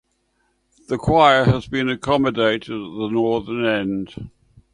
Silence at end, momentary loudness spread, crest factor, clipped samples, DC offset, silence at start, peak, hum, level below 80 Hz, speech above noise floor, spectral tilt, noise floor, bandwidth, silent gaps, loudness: 0.45 s; 15 LU; 20 dB; under 0.1%; under 0.1%; 0.9 s; 0 dBFS; none; -44 dBFS; 48 dB; -6.5 dB/octave; -67 dBFS; 10.5 kHz; none; -19 LUFS